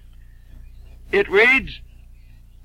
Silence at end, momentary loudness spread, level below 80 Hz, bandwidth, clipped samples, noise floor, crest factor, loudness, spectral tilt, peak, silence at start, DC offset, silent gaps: 0.8 s; 23 LU; -42 dBFS; 15.5 kHz; under 0.1%; -44 dBFS; 18 dB; -16 LUFS; -4.5 dB/octave; -4 dBFS; 0.55 s; under 0.1%; none